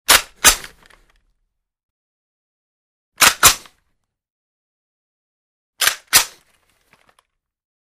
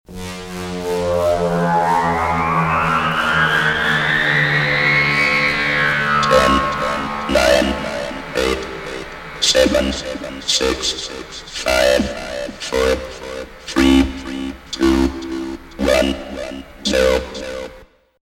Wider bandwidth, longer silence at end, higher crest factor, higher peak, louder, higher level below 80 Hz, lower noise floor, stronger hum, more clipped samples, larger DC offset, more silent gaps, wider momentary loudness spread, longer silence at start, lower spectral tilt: about the same, 16 kHz vs 17 kHz; first, 1.55 s vs 0.4 s; about the same, 22 dB vs 18 dB; about the same, 0 dBFS vs 0 dBFS; first, -14 LUFS vs -17 LUFS; second, -44 dBFS vs -34 dBFS; first, -72 dBFS vs -44 dBFS; neither; neither; neither; first, 1.83-3.12 s, 4.30-5.73 s vs none; about the same, 14 LU vs 15 LU; about the same, 0.1 s vs 0.1 s; second, 1 dB/octave vs -4 dB/octave